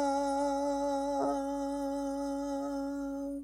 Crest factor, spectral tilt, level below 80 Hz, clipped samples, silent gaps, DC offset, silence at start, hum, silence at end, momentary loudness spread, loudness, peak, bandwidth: 12 dB; -4.5 dB/octave; -58 dBFS; under 0.1%; none; under 0.1%; 0 s; none; 0 s; 5 LU; -34 LUFS; -20 dBFS; 14.5 kHz